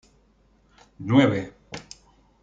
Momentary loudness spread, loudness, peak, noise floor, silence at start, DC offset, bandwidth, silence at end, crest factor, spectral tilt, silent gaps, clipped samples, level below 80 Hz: 21 LU; -21 LUFS; -6 dBFS; -61 dBFS; 1 s; under 0.1%; 7.8 kHz; 0.6 s; 20 dB; -7 dB/octave; none; under 0.1%; -60 dBFS